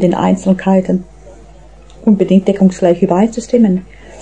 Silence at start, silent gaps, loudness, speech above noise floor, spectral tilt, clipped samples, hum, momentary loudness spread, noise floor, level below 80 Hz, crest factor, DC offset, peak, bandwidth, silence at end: 0 s; none; -13 LUFS; 27 dB; -8 dB/octave; under 0.1%; none; 8 LU; -38 dBFS; -40 dBFS; 12 dB; 0.6%; 0 dBFS; 9 kHz; 0 s